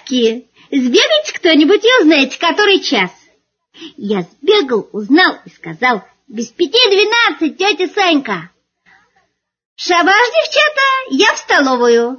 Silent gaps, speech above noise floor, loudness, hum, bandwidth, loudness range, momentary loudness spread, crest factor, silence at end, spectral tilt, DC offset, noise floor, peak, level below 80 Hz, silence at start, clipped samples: 9.65-9.76 s; 49 dB; -12 LUFS; none; 7 kHz; 4 LU; 12 LU; 14 dB; 0 s; -3 dB/octave; under 0.1%; -61 dBFS; 0 dBFS; -64 dBFS; 0.05 s; under 0.1%